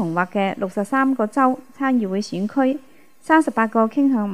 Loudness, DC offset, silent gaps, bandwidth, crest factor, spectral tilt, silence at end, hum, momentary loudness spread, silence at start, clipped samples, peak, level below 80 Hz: -20 LUFS; 0.4%; none; 12 kHz; 18 dB; -6.5 dB/octave; 0 s; none; 7 LU; 0 s; under 0.1%; -2 dBFS; -70 dBFS